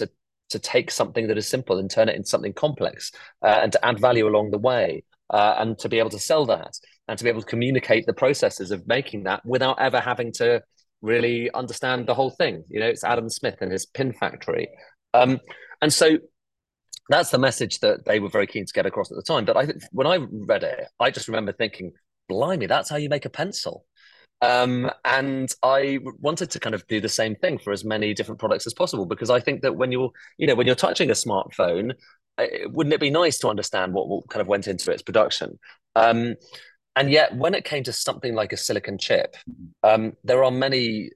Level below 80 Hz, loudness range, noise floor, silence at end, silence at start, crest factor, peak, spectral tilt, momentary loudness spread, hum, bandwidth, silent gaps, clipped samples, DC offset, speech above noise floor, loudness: -60 dBFS; 3 LU; -84 dBFS; 0.05 s; 0 s; 20 dB; -4 dBFS; -4 dB/octave; 9 LU; none; 12.5 kHz; none; under 0.1%; under 0.1%; 61 dB; -23 LUFS